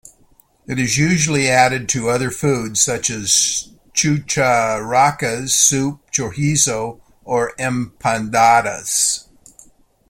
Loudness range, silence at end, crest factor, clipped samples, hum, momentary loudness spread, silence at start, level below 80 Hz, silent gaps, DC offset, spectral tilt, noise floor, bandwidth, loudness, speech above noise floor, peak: 2 LU; 0.9 s; 18 dB; under 0.1%; none; 9 LU; 0.7 s; -48 dBFS; none; under 0.1%; -3 dB/octave; -54 dBFS; 16.5 kHz; -16 LUFS; 37 dB; 0 dBFS